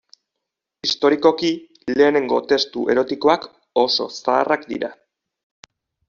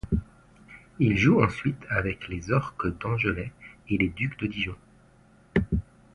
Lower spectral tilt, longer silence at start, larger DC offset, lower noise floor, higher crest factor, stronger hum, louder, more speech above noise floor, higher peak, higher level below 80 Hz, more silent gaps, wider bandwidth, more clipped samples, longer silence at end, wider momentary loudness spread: second, -1.5 dB/octave vs -7.5 dB/octave; first, 0.85 s vs 0.05 s; neither; first, -82 dBFS vs -57 dBFS; about the same, 18 dB vs 22 dB; neither; first, -19 LUFS vs -27 LUFS; first, 63 dB vs 31 dB; first, -2 dBFS vs -6 dBFS; second, -62 dBFS vs -42 dBFS; neither; second, 7.4 kHz vs 11 kHz; neither; first, 1.15 s vs 0.35 s; second, 9 LU vs 12 LU